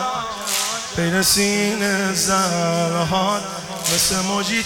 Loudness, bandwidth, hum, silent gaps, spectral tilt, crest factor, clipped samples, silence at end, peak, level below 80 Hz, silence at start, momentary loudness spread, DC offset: -19 LUFS; 18 kHz; none; none; -3 dB/octave; 16 dB; under 0.1%; 0 s; -4 dBFS; -48 dBFS; 0 s; 8 LU; under 0.1%